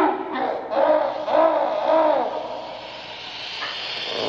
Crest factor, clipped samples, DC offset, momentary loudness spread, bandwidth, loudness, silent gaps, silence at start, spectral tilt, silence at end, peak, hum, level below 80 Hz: 16 dB; under 0.1%; under 0.1%; 14 LU; 7.2 kHz; -22 LUFS; none; 0 s; -4 dB/octave; 0 s; -6 dBFS; none; -64 dBFS